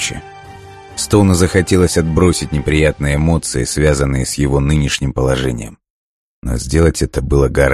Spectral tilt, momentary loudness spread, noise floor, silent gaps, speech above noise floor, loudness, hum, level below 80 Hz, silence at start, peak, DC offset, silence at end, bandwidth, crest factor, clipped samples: -5.5 dB/octave; 10 LU; -35 dBFS; 5.90-6.42 s; 22 dB; -15 LUFS; none; -24 dBFS; 0 s; 0 dBFS; under 0.1%; 0 s; 13 kHz; 14 dB; under 0.1%